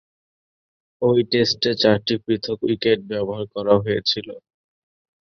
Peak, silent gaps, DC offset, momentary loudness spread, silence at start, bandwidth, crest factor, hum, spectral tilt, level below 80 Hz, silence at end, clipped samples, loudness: -2 dBFS; none; under 0.1%; 8 LU; 1 s; 7 kHz; 20 dB; none; -5.5 dB/octave; -56 dBFS; 0.85 s; under 0.1%; -20 LUFS